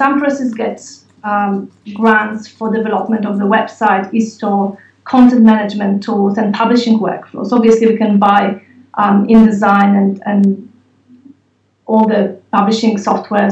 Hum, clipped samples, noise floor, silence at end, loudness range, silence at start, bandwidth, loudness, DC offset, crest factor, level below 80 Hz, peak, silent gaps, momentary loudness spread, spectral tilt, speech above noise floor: none; under 0.1%; -58 dBFS; 0 s; 4 LU; 0 s; 8 kHz; -13 LUFS; under 0.1%; 12 dB; -52 dBFS; 0 dBFS; none; 12 LU; -7 dB/octave; 46 dB